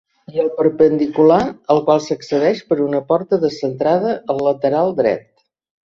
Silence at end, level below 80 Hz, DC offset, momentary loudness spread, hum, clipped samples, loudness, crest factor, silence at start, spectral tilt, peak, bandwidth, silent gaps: 0.65 s; -56 dBFS; under 0.1%; 7 LU; none; under 0.1%; -17 LUFS; 16 dB; 0.3 s; -7 dB/octave; -2 dBFS; 7.4 kHz; none